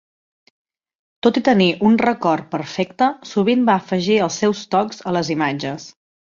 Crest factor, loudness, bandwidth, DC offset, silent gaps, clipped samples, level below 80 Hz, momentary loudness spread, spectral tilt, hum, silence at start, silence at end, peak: 16 dB; -18 LUFS; 7.6 kHz; under 0.1%; none; under 0.1%; -60 dBFS; 8 LU; -5.5 dB/octave; none; 1.25 s; 0.4 s; -2 dBFS